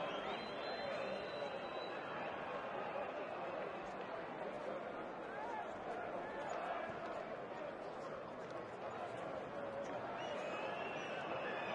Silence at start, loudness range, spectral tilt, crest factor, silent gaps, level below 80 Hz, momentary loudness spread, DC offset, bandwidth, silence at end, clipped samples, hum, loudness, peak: 0 s; 2 LU; -5 dB/octave; 16 dB; none; -76 dBFS; 4 LU; under 0.1%; 11 kHz; 0 s; under 0.1%; none; -45 LUFS; -30 dBFS